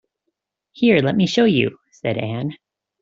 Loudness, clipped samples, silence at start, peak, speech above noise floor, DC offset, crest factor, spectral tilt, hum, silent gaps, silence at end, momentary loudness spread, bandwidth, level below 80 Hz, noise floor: -19 LUFS; under 0.1%; 0.75 s; -2 dBFS; 59 dB; under 0.1%; 18 dB; -6.5 dB/octave; none; none; 0.45 s; 12 LU; 7.6 kHz; -58 dBFS; -77 dBFS